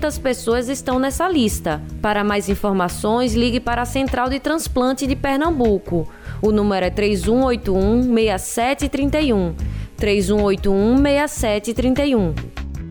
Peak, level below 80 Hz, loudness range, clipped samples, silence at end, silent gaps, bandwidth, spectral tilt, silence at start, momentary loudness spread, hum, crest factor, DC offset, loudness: -6 dBFS; -30 dBFS; 2 LU; under 0.1%; 0 s; none; over 20 kHz; -5.5 dB/octave; 0 s; 6 LU; none; 12 dB; under 0.1%; -19 LUFS